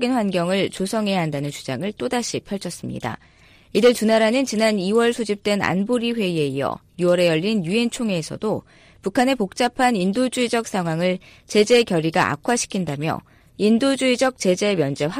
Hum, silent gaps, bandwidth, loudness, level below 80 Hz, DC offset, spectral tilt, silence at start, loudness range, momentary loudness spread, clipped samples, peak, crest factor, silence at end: none; none; 15.5 kHz; -21 LUFS; -56 dBFS; under 0.1%; -5 dB/octave; 0 s; 3 LU; 10 LU; under 0.1%; -6 dBFS; 14 dB; 0 s